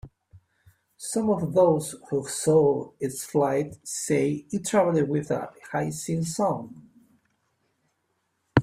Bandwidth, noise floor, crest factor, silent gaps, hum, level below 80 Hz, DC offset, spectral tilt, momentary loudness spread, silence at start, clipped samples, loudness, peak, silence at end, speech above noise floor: 16 kHz; -75 dBFS; 22 dB; none; none; -56 dBFS; under 0.1%; -5.5 dB/octave; 11 LU; 0.05 s; under 0.1%; -26 LUFS; -4 dBFS; 0 s; 50 dB